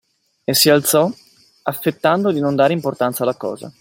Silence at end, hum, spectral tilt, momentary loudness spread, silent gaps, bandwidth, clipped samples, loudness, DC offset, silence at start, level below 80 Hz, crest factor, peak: 0.1 s; none; -4 dB/octave; 14 LU; none; 16.5 kHz; under 0.1%; -17 LUFS; under 0.1%; 0.5 s; -60 dBFS; 18 dB; 0 dBFS